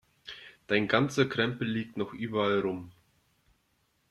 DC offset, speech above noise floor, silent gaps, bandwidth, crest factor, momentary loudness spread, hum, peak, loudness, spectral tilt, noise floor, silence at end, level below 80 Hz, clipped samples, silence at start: under 0.1%; 44 dB; none; 13.5 kHz; 22 dB; 19 LU; none; -10 dBFS; -29 LUFS; -5.5 dB/octave; -73 dBFS; 1.2 s; -66 dBFS; under 0.1%; 0.25 s